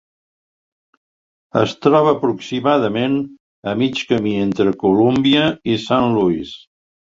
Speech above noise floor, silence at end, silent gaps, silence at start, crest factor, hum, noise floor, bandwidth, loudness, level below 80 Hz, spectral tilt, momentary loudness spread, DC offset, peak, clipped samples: over 74 dB; 0.65 s; 3.40-3.63 s; 1.55 s; 18 dB; none; under -90 dBFS; 7.6 kHz; -17 LUFS; -52 dBFS; -6.5 dB/octave; 10 LU; under 0.1%; 0 dBFS; under 0.1%